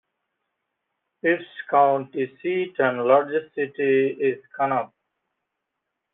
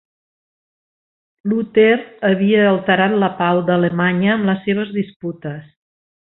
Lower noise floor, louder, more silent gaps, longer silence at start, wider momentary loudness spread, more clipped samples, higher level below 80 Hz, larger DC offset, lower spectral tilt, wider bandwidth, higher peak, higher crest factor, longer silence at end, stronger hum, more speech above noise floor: second, -81 dBFS vs under -90 dBFS; second, -23 LUFS vs -16 LUFS; second, none vs 5.16-5.20 s; second, 1.25 s vs 1.45 s; second, 8 LU vs 14 LU; neither; second, -76 dBFS vs -60 dBFS; neither; second, -4 dB/octave vs -11.5 dB/octave; about the same, 3.9 kHz vs 4.1 kHz; about the same, -4 dBFS vs -2 dBFS; about the same, 20 dB vs 16 dB; first, 1.3 s vs 0.75 s; neither; second, 59 dB vs over 74 dB